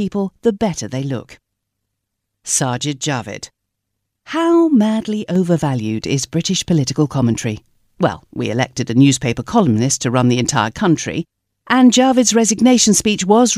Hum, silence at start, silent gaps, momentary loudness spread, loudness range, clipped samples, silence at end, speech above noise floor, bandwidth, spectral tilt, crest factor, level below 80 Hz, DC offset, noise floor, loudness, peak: none; 0 s; none; 12 LU; 8 LU; under 0.1%; 0 s; 61 dB; 15.5 kHz; -4.5 dB/octave; 16 dB; -48 dBFS; under 0.1%; -76 dBFS; -16 LUFS; 0 dBFS